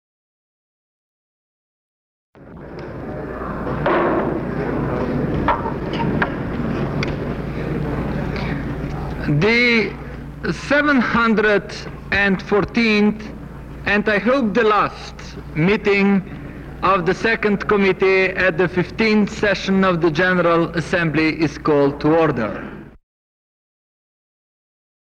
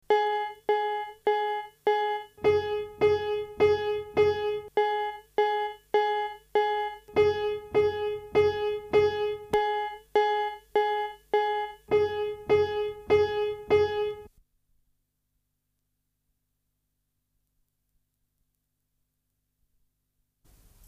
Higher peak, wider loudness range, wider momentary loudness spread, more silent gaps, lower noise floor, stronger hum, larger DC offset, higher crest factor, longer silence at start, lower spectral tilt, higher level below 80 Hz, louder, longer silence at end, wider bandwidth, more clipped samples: first, -4 dBFS vs -12 dBFS; first, 7 LU vs 3 LU; first, 15 LU vs 7 LU; neither; first, under -90 dBFS vs -79 dBFS; second, none vs 50 Hz at -70 dBFS; neither; about the same, 14 dB vs 16 dB; first, 2.35 s vs 0.1 s; about the same, -6.5 dB/octave vs -5.5 dB/octave; first, -38 dBFS vs -60 dBFS; first, -18 LUFS vs -27 LUFS; second, 2.15 s vs 6.6 s; first, 9.4 kHz vs 7 kHz; neither